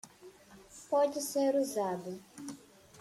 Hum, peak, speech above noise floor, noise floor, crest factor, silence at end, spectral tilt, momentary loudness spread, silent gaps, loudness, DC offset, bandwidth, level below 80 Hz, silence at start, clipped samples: none; -18 dBFS; 24 dB; -56 dBFS; 16 dB; 0 s; -4 dB/octave; 22 LU; none; -32 LUFS; under 0.1%; 15.5 kHz; -76 dBFS; 0.05 s; under 0.1%